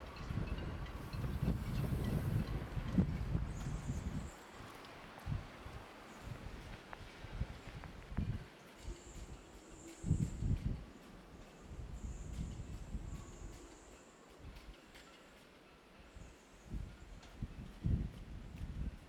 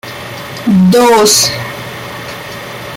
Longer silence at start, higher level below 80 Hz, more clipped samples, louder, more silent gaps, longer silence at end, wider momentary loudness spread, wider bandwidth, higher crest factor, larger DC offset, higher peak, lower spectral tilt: about the same, 0 s vs 0.05 s; about the same, -48 dBFS vs -46 dBFS; neither; second, -44 LUFS vs -8 LUFS; neither; about the same, 0 s vs 0 s; about the same, 19 LU vs 17 LU; about the same, 17.5 kHz vs 16.5 kHz; first, 22 dB vs 12 dB; neither; second, -20 dBFS vs 0 dBFS; first, -7 dB/octave vs -4 dB/octave